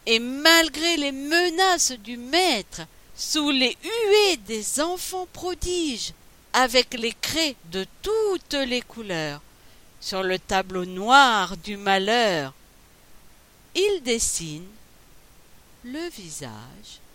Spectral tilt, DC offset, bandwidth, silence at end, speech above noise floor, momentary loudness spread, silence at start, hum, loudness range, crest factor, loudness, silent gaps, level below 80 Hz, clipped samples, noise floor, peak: -2 dB/octave; under 0.1%; 17 kHz; 0.1 s; 29 dB; 17 LU; 0.05 s; none; 7 LU; 22 dB; -22 LUFS; none; -50 dBFS; under 0.1%; -53 dBFS; -2 dBFS